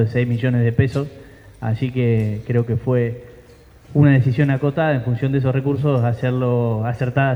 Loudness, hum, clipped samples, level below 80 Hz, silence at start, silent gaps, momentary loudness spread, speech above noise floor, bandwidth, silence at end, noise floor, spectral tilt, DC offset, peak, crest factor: -19 LUFS; none; under 0.1%; -46 dBFS; 0 s; none; 7 LU; 28 dB; 5.8 kHz; 0 s; -46 dBFS; -9.5 dB/octave; under 0.1%; -2 dBFS; 16 dB